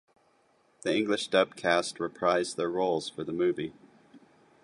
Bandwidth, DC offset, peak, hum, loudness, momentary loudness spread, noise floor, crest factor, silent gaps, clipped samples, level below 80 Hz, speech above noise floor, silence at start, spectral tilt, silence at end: 11.5 kHz; under 0.1%; -8 dBFS; none; -29 LUFS; 9 LU; -67 dBFS; 22 dB; none; under 0.1%; -70 dBFS; 38 dB; 0.85 s; -4 dB/octave; 0.45 s